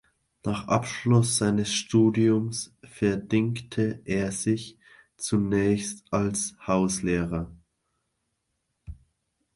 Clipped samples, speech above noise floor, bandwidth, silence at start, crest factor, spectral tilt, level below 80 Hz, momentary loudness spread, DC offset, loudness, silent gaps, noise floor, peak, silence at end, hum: under 0.1%; 53 dB; 11.5 kHz; 0.45 s; 18 dB; -5.5 dB/octave; -52 dBFS; 10 LU; under 0.1%; -26 LUFS; none; -78 dBFS; -8 dBFS; 0.6 s; none